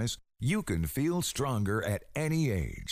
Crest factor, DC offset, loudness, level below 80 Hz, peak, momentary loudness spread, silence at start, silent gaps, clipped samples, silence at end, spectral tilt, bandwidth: 12 dB; under 0.1%; -31 LUFS; -46 dBFS; -18 dBFS; 5 LU; 0 s; none; under 0.1%; 0 s; -5.5 dB/octave; 16 kHz